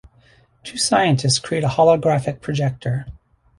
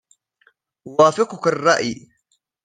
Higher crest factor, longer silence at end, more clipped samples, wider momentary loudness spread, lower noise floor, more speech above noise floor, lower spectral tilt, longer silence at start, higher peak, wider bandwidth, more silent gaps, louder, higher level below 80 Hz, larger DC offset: about the same, 18 dB vs 20 dB; second, 0.45 s vs 0.7 s; neither; first, 14 LU vs 11 LU; second, -54 dBFS vs -68 dBFS; second, 36 dB vs 51 dB; about the same, -4.5 dB/octave vs -4 dB/octave; second, 0.65 s vs 0.85 s; about the same, -2 dBFS vs -2 dBFS; first, 11.5 kHz vs 9.6 kHz; neither; about the same, -19 LUFS vs -18 LUFS; first, -48 dBFS vs -64 dBFS; neither